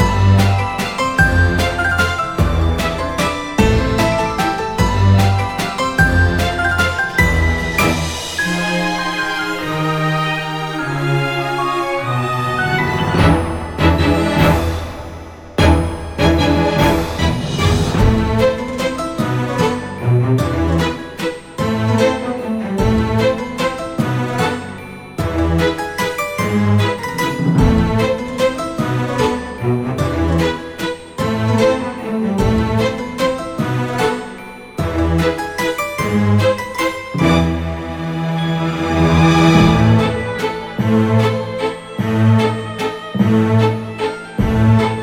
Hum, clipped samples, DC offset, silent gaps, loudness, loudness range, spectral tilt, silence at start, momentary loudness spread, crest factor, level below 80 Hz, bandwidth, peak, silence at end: none; under 0.1%; under 0.1%; none; -16 LUFS; 4 LU; -6 dB/octave; 0 s; 8 LU; 16 dB; -28 dBFS; 18.5 kHz; 0 dBFS; 0 s